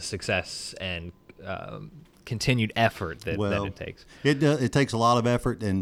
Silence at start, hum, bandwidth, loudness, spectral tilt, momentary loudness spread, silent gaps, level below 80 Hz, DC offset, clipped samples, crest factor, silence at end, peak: 0 s; none; 15.5 kHz; -26 LUFS; -5.5 dB/octave; 18 LU; none; -50 dBFS; under 0.1%; under 0.1%; 20 dB; 0 s; -8 dBFS